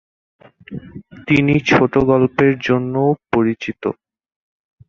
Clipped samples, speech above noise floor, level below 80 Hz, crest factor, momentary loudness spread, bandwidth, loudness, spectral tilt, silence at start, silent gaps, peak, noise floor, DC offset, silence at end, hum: under 0.1%; 22 dB; -46 dBFS; 18 dB; 20 LU; 7.2 kHz; -16 LUFS; -7.5 dB/octave; 0.7 s; none; 0 dBFS; -37 dBFS; under 0.1%; 0.95 s; none